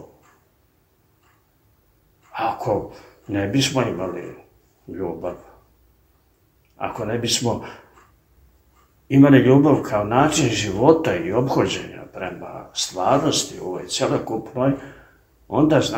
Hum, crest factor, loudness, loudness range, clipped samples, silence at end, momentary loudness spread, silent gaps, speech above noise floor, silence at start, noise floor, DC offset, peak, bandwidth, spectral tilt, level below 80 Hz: none; 22 dB; -20 LUFS; 11 LU; under 0.1%; 0 s; 17 LU; none; 42 dB; 0 s; -61 dBFS; under 0.1%; 0 dBFS; 16 kHz; -5 dB/octave; -52 dBFS